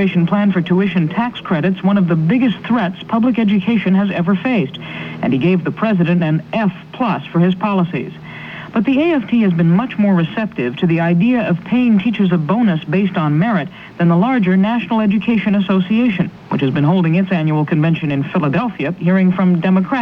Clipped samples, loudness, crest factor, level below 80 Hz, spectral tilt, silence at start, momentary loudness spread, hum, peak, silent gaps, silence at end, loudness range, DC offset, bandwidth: under 0.1%; -15 LUFS; 12 dB; -52 dBFS; -9.5 dB/octave; 0 s; 6 LU; none; -2 dBFS; none; 0 s; 2 LU; under 0.1%; 5.2 kHz